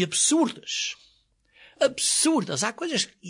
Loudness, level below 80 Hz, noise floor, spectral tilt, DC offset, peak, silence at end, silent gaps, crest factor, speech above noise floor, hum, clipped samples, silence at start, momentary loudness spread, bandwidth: -24 LUFS; -72 dBFS; -64 dBFS; -2 dB/octave; under 0.1%; -10 dBFS; 0 s; none; 16 dB; 39 dB; none; under 0.1%; 0 s; 8 LU; 11 kHz